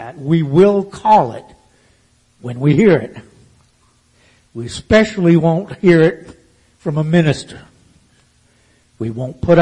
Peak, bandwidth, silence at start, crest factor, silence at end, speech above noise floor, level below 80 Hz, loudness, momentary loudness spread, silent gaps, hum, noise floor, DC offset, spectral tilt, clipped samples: 0 dBFS; 10 kHz; 0 s; 16 dB; 0 s; 42 dB; -44 dBFS; -14 LUFS; 19 LU; none; none; -55 dBFS; under 0.1%; -7.5 dB/octave; under 0.1%